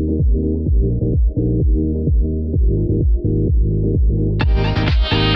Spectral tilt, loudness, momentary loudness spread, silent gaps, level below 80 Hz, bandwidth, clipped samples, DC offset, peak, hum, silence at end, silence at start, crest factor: -9 dB/octave; -18 LUFS; 1 LU; none; -18 dBFS; 5.8 kHz; under 0.1%; under 0.1%; -4 dBFS; none; 0 s; 0 s; 12 dB